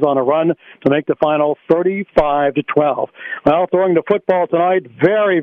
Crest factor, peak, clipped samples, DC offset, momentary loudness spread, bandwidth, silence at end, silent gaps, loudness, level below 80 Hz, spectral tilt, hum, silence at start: 14 dB; 0 dBFS; under 0.1%; under 0.1%; 4 LU; 5.4 kHz; 0 s; none; -16 LUFS; -46 dBFS; -9 dB/octave; none; 0 s